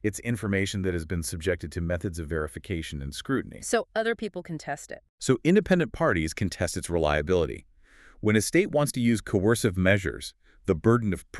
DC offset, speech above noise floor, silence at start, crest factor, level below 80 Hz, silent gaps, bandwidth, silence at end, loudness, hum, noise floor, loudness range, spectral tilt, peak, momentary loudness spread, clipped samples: under 0.1%; 28 dB; 0.05 s; 20 dB; -44 dBFS; 5.09-5.18 s; 13.5 kHz; 0 s; -27 LUFS; none; -55 dBFS; 6 LU; -5.5 dB/octave; -8 dBFS; 12 LU; under 0.1%